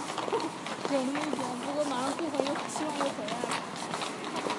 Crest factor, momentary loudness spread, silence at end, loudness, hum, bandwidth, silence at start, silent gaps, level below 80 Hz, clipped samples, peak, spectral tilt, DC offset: 22 dB; 4 LU; 0 s; -32 LUFS; none; 11.5 kHz; 0 s; none; -78 dBFS; under 0.1%; -10 dBFS; -3.5 dB/octave; under 0.1%